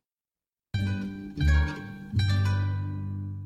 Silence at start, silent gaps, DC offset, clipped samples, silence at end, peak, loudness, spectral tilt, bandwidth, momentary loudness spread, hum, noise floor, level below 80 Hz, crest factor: 0.75 s; none; under 0.1%; under 0.1%; 0 s; -12 dBFS; -29 LUFS; -6.5 dB/octave; 8.4 kHz; 10 LU; none; under -90 dBFS; -34 dBFS; 16 dB